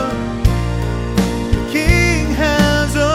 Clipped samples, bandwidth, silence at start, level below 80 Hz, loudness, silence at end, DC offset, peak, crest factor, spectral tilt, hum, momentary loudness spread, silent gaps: under 0.1%; 16 kHz; 0 s; -20 dBFS; -16 LUFS; 0 s; under 0.1%; 0 dBFS; 16 dB; -5.5 dB/octave; none; 6 LU; none